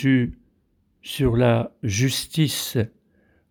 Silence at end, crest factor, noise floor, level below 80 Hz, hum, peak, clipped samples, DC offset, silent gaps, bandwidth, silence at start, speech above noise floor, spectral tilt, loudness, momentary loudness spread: 0.65 s; 16 dB; -66 dBFS; -44 dBFS; none; -6 dBFS; under 0.1%; under 0.1%; none; over 20 kHz; 0 s; 44 dB; -5.5 dB/octave; -23 LUFS; 11 LU